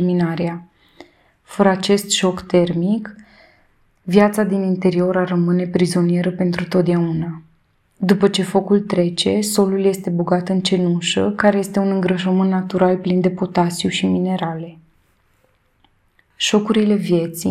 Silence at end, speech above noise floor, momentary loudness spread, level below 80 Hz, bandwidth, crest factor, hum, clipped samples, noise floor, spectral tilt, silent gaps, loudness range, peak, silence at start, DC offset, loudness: 0 s; 43 dB; 7 LU; -56 dBFS; 14.5 kHz; 18 dB; none; under 0.1%; -60 dBFS; -5.5 dB/octave; none; 4 LU; 0 dBFS; 0 s; under 0.1%; -18 LUFS